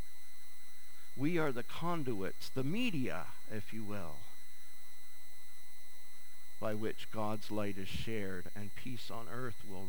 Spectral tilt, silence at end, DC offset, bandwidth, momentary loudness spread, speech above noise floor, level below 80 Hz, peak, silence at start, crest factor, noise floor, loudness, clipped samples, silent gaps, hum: -5.5 dB/octave; 0 s; 3%; over 20 kHz; 20 LU; 20 dB; -66 dBFS; -20 dBFS; 0 s; 18 dB; -60 dBFS; -41 LUFS; under 0.1%; none; none